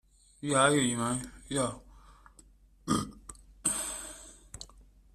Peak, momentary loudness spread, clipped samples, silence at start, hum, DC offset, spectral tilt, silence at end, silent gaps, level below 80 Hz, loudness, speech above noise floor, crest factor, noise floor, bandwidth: -10 dBFS; 24 LU; under 0.1%; 0.4 s; none; under 0.1%; -3.5 dB/octave; 0.35 s; none; -56 dBFS; -30 LUFS; 30 dB; 24 dB; -59 dBFS; 15.5 kHz